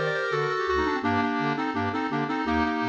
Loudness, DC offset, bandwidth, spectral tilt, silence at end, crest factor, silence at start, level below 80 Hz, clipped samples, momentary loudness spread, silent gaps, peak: -26 LUFS; under 0.1%; 8.2 kHz; -6 dB/octave; 0 s; 14 dB; 0 s; -48 dBFS; under 0.1%; 2 LU; none; -12 dBFS